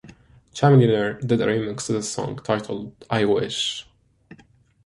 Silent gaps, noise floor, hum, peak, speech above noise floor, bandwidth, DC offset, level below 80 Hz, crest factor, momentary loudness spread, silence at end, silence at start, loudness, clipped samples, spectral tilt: none; -55 dBFS; none; -4 dBFS; 33 dB; 11.5 kHz; under 0.1%; -56 dBFS; 20 dB; 14 LU; 0.5 s; 0.05 s; -22 LUFS; under 0.1%; -5.5 dB/octave